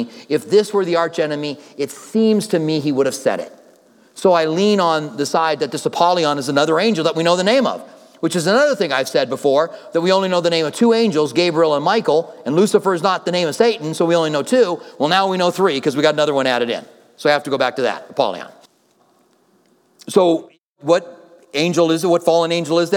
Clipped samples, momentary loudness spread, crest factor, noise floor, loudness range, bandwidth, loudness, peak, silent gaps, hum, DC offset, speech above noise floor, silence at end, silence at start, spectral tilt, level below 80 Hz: under 0.1%; 7 LU; 16 dB; -58 dBFS; 5 LU; 17.5 kHz; -17 LUFS; 0 dBFS; 20.60-20.76 s; none; under 0.1%; 41 dB; 0 s; 0 s; -4.5 dB/octave; -76 dBFS